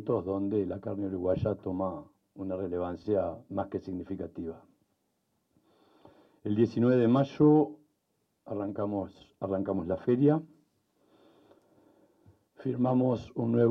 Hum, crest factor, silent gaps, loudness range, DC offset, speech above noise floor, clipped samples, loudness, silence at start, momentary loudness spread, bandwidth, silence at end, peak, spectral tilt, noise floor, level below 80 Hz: none; 18 dB; none; 8 LU; under 0.1%; 49 dB; under 0.1%; -30 LUFS; 0 s; 15 LU; 6.2 kHz; 0 s; -12 dBFS; -10 dB/octave; -77 dBFS; -66 dBFS